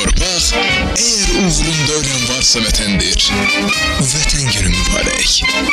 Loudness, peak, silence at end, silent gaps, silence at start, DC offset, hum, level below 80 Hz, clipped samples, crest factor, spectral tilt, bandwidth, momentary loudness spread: -12 LUFS; -4 dBFS; 0 s; none; 0 s; under 0.1%; none; -22 dBFS; under 0.1%; 10 dB; -2.5 dB/octave; 16 kHz; 3 LU